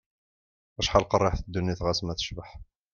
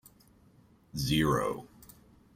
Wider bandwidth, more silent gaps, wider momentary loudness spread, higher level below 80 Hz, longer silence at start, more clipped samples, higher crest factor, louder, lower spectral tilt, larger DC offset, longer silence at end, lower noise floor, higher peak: second, 7.2 kHz vs 16 kHz; neither; first, 19 LU vs 16 LU; first, -42 dBFS vs -52 dBFS; second, 0.8 s vs 0.95 s; neither; about the same, 24 dB vs 20 dB; first, -27 LUFS vs -31 LUFS; about the same, -5 dB/octave vs -5 dB/octave; neither; second, 0.3 s vs 0.7 s; first, under -90 dBFS vs -62 dBFS; first, -6 dBFS vs -14 dBFS